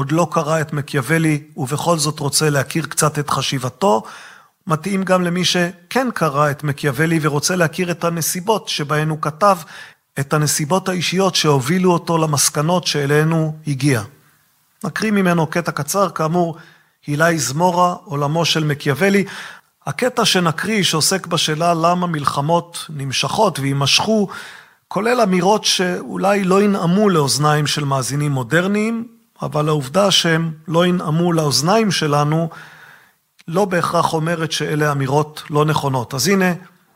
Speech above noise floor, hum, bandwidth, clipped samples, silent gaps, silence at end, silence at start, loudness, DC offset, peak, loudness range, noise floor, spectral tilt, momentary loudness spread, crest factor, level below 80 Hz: 41 dB; none; 16 kHz; under 0.1%; none; 0.3 s; 0 s; -17 LUFS; under 0.1%; 0 dBFS; 3 LU; -58 dBFS; -4.5 dB/octave; 8 LU; 16 dB; -58 dBFS